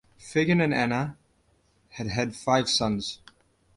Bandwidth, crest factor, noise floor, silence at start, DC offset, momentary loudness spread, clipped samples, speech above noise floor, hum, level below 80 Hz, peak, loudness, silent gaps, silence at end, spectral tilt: 11.5 kHz; 20 dB; -66 dBFS; 0.2 s; under 0.1%; 13 LU; under 0.1%; 41 dB; none; -54 dBFS; -8 dBFS; -26 LUFS; none; 0.6 s; -4.5 dB/octave